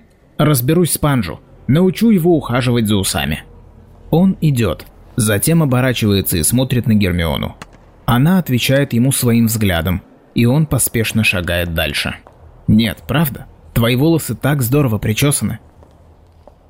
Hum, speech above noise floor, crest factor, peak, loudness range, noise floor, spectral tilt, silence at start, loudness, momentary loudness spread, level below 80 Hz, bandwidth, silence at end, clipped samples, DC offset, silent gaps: none; 31 dB; 12 dB; -4 dBFS; 2 LU; -45 dBFS; -5 dB/octave; 0.4 s; -15 LUFS; 10 LU; -38 dBFS; 16.5 kHz; 1.15 s; under 0.1%; 0.2%; none